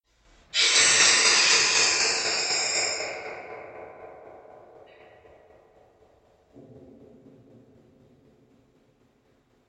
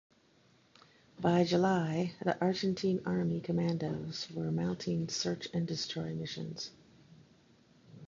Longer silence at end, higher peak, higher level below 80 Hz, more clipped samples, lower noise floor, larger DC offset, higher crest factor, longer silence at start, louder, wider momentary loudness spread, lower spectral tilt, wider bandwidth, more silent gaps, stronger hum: first, 5.3 s vs 0.05 s; first, -6 dBFS vs -14 dBFS; about the same, -66 dBFS vs -66 dBFS; neither; about the same, -65 dBFS vs -67 dBFS; neither; about the same, 22 dB vs 20 dB; second, 0.55 s vs 1.2 s; first, -19 LUFS vs -34 LUFS; first, 25 LU vs 10 LU; second, 1.5 dB/octave vs -6 dB/octave; first, 9.4 kHz vs 7.6 kHz; neither; neither